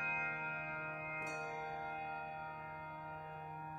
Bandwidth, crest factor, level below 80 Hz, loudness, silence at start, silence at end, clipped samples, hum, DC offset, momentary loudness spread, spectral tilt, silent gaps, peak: 16 kHz; 16 dB; -72 dBFS; -43 LUFS; 0 s; 0 s; under 0.1%; none; under 0.1%; 9 LU; -5.5 dB/octave; none; -28 dBFS